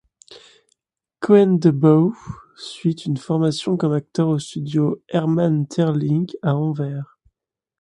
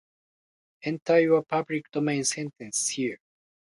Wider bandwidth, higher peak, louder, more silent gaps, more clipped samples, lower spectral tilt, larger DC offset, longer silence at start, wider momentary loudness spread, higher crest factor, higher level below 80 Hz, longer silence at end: about the same, 11 kHz vs 11.5 kHz; first, -2 dBFS vs -10 dBFS; first, -19 LUFS vs -26 LUFS; second, none vs 1.02-1.06 s; neither; first, -8 dB/octave vs -4 dB/octave; neither; second, 0.3 s vs 0.85 s; about the same, 14 LU vs 12 LU; about the same, 18 dB vs 18 dB; first, -58 dBFS vs -74 dBFS; about the same, 0.75 s vs 0.65 s